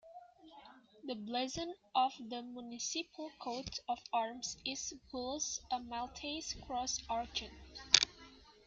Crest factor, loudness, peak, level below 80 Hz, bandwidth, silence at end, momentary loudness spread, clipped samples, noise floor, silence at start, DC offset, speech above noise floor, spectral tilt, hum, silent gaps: 38 dB; -38 LUFS; -2 dBFS; -64 dBFS; 11 kHz; 0.15 s; 17 LU; under 0.1%; -59 dBFS; 0.05 s; under 0.1%; 19 dB; -1 dB/octave; none; none